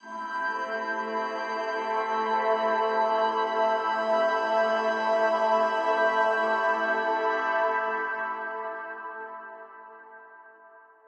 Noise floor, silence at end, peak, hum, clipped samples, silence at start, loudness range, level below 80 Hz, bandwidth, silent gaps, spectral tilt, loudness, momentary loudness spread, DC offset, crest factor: -53 dBFS; 0.3 s; -12 dBFS; none; under 0.1%; 0.05 s; 6 LU; under -90 dBFS; 8.4 kHz; none; -3.5 dB/octave; -26 LUFS; 13 LU; under 0.1%; 16 dB